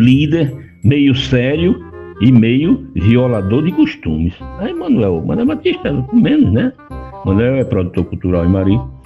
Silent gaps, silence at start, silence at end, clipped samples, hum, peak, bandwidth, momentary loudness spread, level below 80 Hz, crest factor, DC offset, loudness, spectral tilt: none; 0 s; 0.05 s; under 0.1%; none; 0 dBFS; 7 kHz; 10 LU; -34 dBFS; 14 dB; under 0.1%; -14 LUFS; -8.5 dB/octave